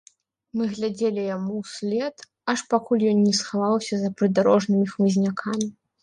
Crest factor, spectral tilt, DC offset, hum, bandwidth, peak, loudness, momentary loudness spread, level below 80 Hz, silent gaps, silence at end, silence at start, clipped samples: 16 dB; -5.5 dB/octave; under 0.1%; none; 10 kHz; -8 dBFS; -24 LUFS; 10 LU; -68 dBFS; none; 0.3 s; 0.55 s; under 0.1%